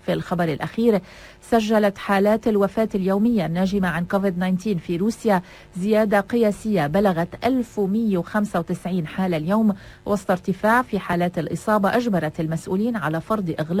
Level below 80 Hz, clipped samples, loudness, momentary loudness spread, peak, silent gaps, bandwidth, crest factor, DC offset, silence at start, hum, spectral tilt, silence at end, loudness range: -50 dBFS; under 0.1%; -22 LUFS; 6 LU; -4 dBFS; none; 16 kHz; 16 dB; under 0.1%; 0.05 s; none; -7 dB/octave; 0 s; 2 LU